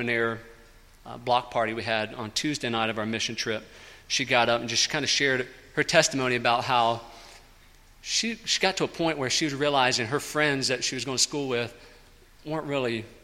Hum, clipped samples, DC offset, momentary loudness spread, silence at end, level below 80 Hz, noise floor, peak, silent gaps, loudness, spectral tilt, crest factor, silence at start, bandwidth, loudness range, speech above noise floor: none; under 0.1%; under 0.1%; 10 LU; 0.05 s; -56 dBFS; -54 dBFS; -4 dBFS; none; -26 LUFS; -2.5 dB/octave; 24 dB; 0 s; 16 kHz; 5 LU; 27 dB